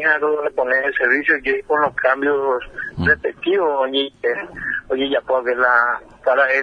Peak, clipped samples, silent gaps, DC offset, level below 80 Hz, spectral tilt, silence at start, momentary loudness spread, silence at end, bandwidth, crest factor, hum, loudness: -2 dBFS; under 0.1%; none; under 0.1%; -48 dBFS; -6 dB/octave; 0 s; 7 LU; 0 s; 6.6 kHz; 16 dB; none; -18 LUFS